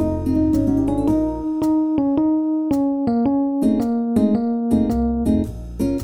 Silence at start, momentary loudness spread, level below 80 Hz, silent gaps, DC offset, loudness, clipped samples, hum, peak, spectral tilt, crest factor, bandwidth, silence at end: 0 s; 3 LU; -34 dBFS; none; 0.4%; -19 LUFS; under 0.1%; none; -6 dBFS; -9 dB/octave; 12 dB; 15.5 kHz; 0 s